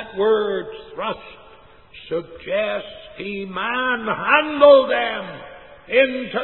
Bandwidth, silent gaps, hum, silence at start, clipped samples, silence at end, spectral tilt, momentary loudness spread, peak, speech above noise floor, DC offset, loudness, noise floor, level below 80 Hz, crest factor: 4.2 kHz; none; none; 0 s; under 0.1%; 0 s; -9 dB/octave; 21 LU; 0 dBFS; 28 dB; 0.2%; -19 LUFS; -48 dBFS; -56 dBFS; 20 dB